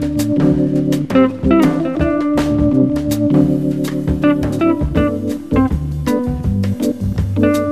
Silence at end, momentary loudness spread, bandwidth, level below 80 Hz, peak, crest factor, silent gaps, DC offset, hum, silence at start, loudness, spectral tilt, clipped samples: 0 s; 5 LU; 15 kHz; -28 dBFS; 0 dBFS; 14 dB; none; 0.7%; none; 0 s; -16 LUFS; -7.5 dB/octave; under 0.1%